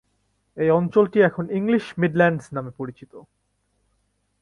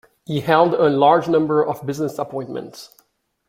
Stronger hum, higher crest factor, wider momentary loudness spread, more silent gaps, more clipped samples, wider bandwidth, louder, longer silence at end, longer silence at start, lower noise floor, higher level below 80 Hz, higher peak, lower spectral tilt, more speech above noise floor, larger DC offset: first, 50 Hz at -55 dBFS vs none; about the same, 18 dB vs 18 dB; about the same, 14 LU vs 15 LU; neither; neither; second, 11 kHz vs 16 kHz; second, -21 LUFS vs -18 LUFS; first, 1.2 s vs 0.6 s; first, 0.55 s vs 0.3 s; first, -70 dBFS vs -60 dBFS; about the same, -60 dBFS vs -62 dBFS; about the same, -4 dBFS vs -2 dBFS; first, -8 dB/octave vs -6.5 dB/octave; first, 49 dB vs 42 dB; neither